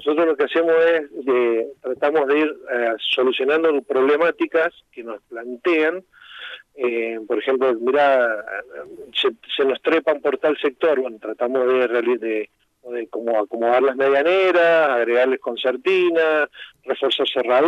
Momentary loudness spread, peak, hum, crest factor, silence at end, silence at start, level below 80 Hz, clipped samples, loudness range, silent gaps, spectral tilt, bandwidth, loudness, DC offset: 14 LU; -6 dBFS; none; 14 dB; 0 s; 0 s; -72 dBFS; under 0.1%; 4 LU; none; -5 dB/octave; 7.6 kHz; -19 LUFS; under 0.1%